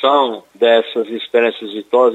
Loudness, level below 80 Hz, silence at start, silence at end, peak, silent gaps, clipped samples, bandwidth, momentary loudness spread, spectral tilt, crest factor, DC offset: -16 LUFS; -72 dBFS; 0 s; 0 s; -2 dBFS; none; under 0.1%; 8 kHz; 8 LU; -4.5 dB/octave; 14 dB; under 0.1%